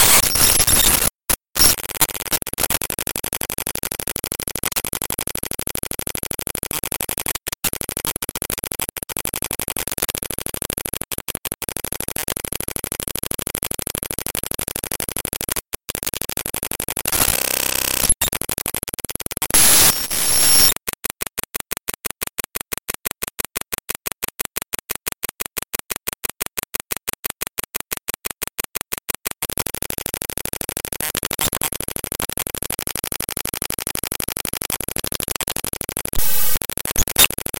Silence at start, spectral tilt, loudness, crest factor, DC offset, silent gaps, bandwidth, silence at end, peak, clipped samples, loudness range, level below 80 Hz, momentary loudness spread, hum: 0 s; -1 dB/octave; -20 LUFS; 22 dB; under 0.1%; 27.19-27.23 s; 17 kHz; 0.25 s; 0 dBFS; under 0.1%; 11 LU; -38 dBFS; 12 LU; none